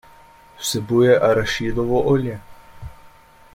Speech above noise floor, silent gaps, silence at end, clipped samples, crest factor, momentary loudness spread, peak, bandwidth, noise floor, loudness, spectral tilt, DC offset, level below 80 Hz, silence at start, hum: 30 dB; none; 0.45 s; under 0.1%; 18 dB; 26 LU; -2 dBFS; 16.5 kHz; -47 dBFS; -19 LUFS; -5.5 dB/octave; under 0.1%; -42 dBFS; 0.6 s; none